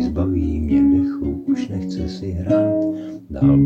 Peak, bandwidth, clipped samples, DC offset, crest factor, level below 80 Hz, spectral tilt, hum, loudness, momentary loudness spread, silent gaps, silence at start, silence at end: -4 dBFS; 7.2 kHz; under 0.1%; under 0.1%; 14 dB; -34 dBFS; -9.5 dB/octave; none; -20 LUFS; 10 LU; none; 0 s; 0 s